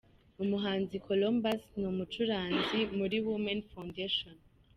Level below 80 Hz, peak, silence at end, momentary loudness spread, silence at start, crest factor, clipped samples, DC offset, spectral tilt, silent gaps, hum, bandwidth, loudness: -62 dBFS; -20 dBFS; 0.4 s; 7 LU; 0.4 s; 14 dB; under 0.1%; under 0.1%; -6.5 dB/octave; none; none; 13.5 kHz; -34 LUFS